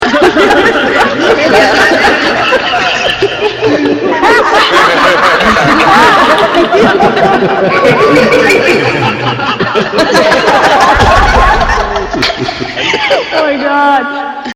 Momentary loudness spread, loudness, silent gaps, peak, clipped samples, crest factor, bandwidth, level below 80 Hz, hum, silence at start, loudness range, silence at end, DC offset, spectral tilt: 6 LU; -7 LUFS; none; 0 dBFS; 1%; 8 dB; 16.5 kHz; -24 dBFS; none; 0 s; 2 LU; 0 s; under 0.1%; -4 dB/octave